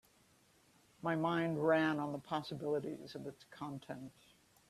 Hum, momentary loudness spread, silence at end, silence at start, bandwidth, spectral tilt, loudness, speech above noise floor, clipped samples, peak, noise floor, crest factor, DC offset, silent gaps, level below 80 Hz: none; 17 LU; 0.6 s; 1 s; 14 kHz; -7 dB/octave; -38 LUFS; 32 dB; under 0.1%; -20 dBFS; -70 dBFS; 20 dB; under 0.1%; none; -76 dBFS